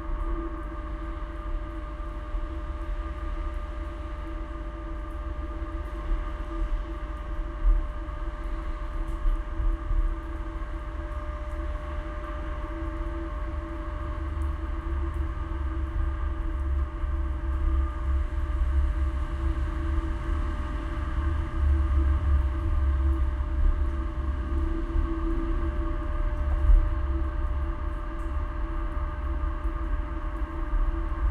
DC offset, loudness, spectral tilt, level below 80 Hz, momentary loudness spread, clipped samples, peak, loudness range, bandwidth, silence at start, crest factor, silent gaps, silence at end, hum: under 0.1%; -32 LUFS; -8.5 dB/octave; -28 dBFS; 9 LU; under 0.1%; -8 dBFS; 8 LU; 4.5 kHz; 0 s; 18 dB; none; 0 s; none